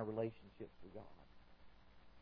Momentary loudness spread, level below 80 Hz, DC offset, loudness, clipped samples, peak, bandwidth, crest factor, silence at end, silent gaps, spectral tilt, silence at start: 24 LU; -70 dBFS; under 0.1%; -50 LUFS; under 0.1%; -28 dBFS; 5.4 kHz; 22 dB; 0 s; none; -7.5 dB/octave; 0 s